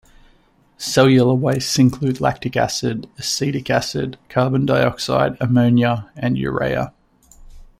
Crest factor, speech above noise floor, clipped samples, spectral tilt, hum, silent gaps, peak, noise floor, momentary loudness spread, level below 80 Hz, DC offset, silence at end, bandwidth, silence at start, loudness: 18 dB; 38 dB; under 0.1%; -5.5 dB/octave; none; none; -2 dBFS; -55 dBFS; 9 LU; -46 dBFS; under 0.1%; 0.15 s; 15.5 kHz; 0.8 s; -18 LUFS